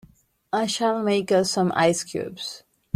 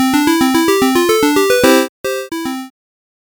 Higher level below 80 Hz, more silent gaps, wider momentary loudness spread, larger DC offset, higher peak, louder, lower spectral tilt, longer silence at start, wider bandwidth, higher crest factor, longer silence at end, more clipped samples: second, -64 dBFS vs -48 dBFS; second, none vs 1.89-2.04 s; about the same, 13 LU vs 11 LU; neither; second, -6 dBFS vs 0 dBFS; second, -23 LUFS vs -13 LUFS; about the same, -4 dB/octave vs -3 dB/octave; first, 0.55 s vs 0 s; second, 15 kHz vs over 20 kHz; about the same, 18 dB vs 14 dB; second, 0.35 s vs 0.6 s; neither